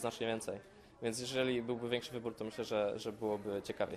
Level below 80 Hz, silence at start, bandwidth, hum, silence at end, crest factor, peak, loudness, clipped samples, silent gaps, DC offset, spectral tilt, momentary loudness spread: -70 dBFS; 0 s; 14 kHz; none; 0 s; 18 dB; -22 dBFS; -39 LUFS; under 0.1%; none; under 0.1%; -4.5 dB/octave; 7 LU